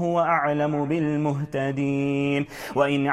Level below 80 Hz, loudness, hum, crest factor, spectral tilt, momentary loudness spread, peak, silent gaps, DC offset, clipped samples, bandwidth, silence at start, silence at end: -58 dBFS; -24 LUFS; none; 16 dB; -7 dB/octave; 5 LU; -8 dBFS; none; under 0.1%; under 0.1%; 14 kHz; 0 s; 0 s